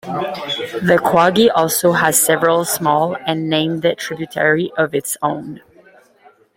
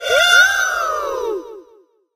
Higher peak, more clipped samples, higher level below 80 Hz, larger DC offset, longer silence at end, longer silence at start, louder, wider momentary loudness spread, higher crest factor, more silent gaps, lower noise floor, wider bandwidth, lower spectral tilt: about the same, 0 dBFS vs 0 dBFS; neither; about the same, -56 dBFS vs -52 dBFS; neither; first, 1 s vs 0.55 s; about the same, 0.05 s vs 0 s; about the same, -16 LUFS vs -14 LUFS; second, 10 LU vs 14 LU; about the same, 16 dB vs 18 dB; neither; about the same, -50 dBFS vs -52 dBFS; about the same, 16.5 kHz vs 15.5 kHz; first, -3.5 dB/octave vs 1 dB/octave